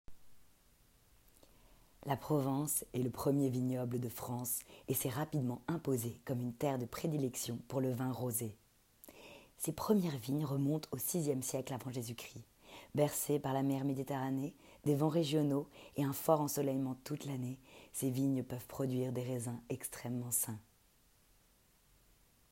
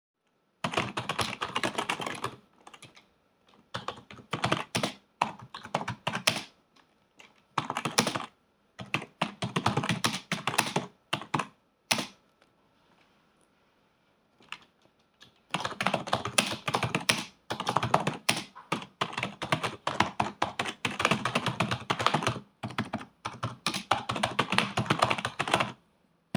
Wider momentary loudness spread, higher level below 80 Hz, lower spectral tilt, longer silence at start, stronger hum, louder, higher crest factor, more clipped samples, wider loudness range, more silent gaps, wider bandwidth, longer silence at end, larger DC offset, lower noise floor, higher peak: about the same, 11 LU vs 12 LU; about the same, -70 dBFS vs -68 dBFS; first, -5.5 dB/octave vs -3.5 dB/octave; second, 0.1 s vs 0.65 s; neither; second, -38 LUFS vs -31 LUFS; second, 22 dB vs 30 dB; neither; second, 4 LU vs 7 LU; neither; second, 16 kHz vs over 20 kHz; first, 1.9 s vs 0.6 s; neither; about the same, -70 dBFS vs -69 dBFS; second, -16 dBFS vs -4 dBFS